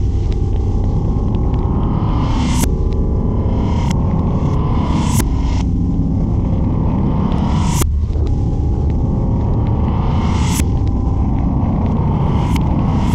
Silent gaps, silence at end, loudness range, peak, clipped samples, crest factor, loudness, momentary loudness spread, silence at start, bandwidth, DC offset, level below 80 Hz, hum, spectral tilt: none; 0 s; 1 LU; 0 dBFS; under 0.1%; 14 dB; -17 LUFS; 2 LU; 0 s; 16 kHz; under 0.1%; -18 dBFS; none; -7 dB/octave